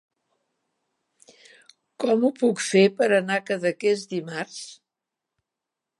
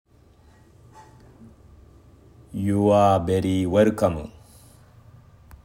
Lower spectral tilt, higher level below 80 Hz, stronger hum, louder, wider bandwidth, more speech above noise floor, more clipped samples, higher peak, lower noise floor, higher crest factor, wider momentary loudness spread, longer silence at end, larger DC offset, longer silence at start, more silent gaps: second, -4.5 dB/octave vs -7.5 dB/octave; second, -82 dBFS vs -52 dBFS; neither; about the same, -23 LUFS vs -21 LUFS; second, 11.5 kHz vs 16 kHz; first, 63 dB vs 34 dB; neither; about the same, -6 dBFS vs -6 dBFS; first, -86 dBFS vs -54 dBFS; about the same, 20 dB vs 20 dB; second, 14 LU vs 17 LU; about the same, 1.25 s vs 1.35 s; neither; second, 2 s vs 2.55 s; neither